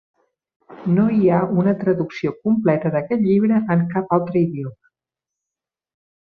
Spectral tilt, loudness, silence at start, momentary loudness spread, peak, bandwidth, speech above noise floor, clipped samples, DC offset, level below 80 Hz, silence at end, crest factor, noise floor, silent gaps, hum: -10.5 dB/octave; -19 LUFS; 0.7 s; 7 LU; -2 dBFS; 6 kHz; 69 dB; under 0.1%; under 0.1%; -60 dBFS; 1.55 s; 18 dB; -87 dBFS; none; none